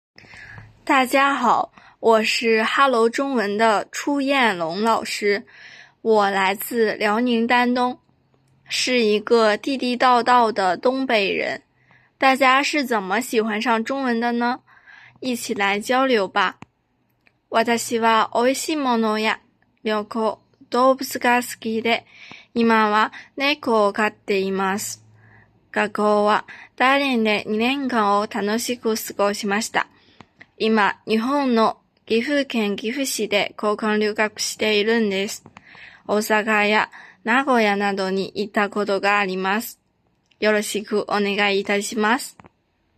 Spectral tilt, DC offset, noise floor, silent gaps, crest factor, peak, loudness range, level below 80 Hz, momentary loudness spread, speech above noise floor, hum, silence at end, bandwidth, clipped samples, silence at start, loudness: -3.5 dB/octave; under 0.1%; -67 dBFS; none; 18 dB; -2 dBFS; 3 LU; -68 dBFS; 8 LU; 47 dB; none; 0.65 s; 15.5 kHz; under 0.1%; 0.35 s; -20 LUFS